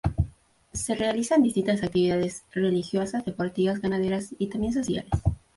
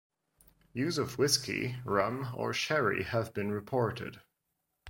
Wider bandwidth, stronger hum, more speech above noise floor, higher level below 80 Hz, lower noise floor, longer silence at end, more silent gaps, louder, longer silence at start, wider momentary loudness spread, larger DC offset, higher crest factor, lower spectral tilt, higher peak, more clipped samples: second, 11.5 kHz vs 16.5 kHz; neither; second, 24 dB vs 51 dB; first, -40 dBFS vs -64 dBFS; second, -49 dBFS vs -83 dBFS; first, 0.2 s vs 0 s; neither; first, -26 LUFS vs -32 LUFS; second, 0.05 s vs 0.75 s; about the same, 8 LU vs 8 LU; neither; second, 16 dB vs 22 dB; first, -6 dB/octave vs -4 dB/octave; about the same, -10 dBFS vs -12 dBFS; neither